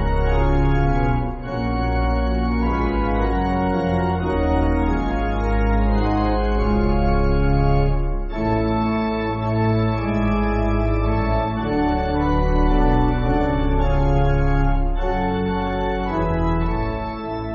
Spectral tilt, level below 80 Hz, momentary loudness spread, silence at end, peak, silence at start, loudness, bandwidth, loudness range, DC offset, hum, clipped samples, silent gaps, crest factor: -7 dB/octave; -22 dBFS; 4 LU; 0 s; -6 dBFS; 0 s; -21 LUFS; 6 kHz; 1 LU; under 0.1%; none; under 0.1%; none; 14 dB